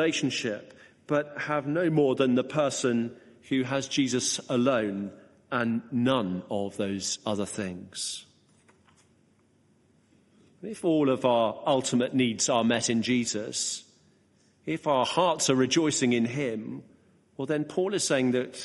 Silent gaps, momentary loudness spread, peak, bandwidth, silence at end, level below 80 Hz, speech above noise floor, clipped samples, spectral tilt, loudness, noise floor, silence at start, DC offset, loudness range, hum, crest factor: none; 11 LU; -10 dBFS; 11.5 kHz; 0 s; -70 dBFS; 38 dB; under 0.1%; -4 dB/octave; -27 LUFS; -64 dBFS; 0 s; under 0.1%; 8 LU; none; 18 dB